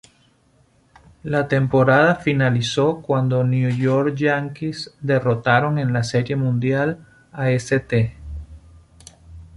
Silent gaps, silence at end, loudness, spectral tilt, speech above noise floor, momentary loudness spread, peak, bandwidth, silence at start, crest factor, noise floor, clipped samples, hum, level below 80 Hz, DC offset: none; 0.1 s; -19 LUFS; -7 dB/octave; 39 dB; 12 LU; -2 dBFS; 11 kHz; 1.25 s; 18 dB; -58 dBFS; under 0.1%; none; -46 dBFS; under 0.1%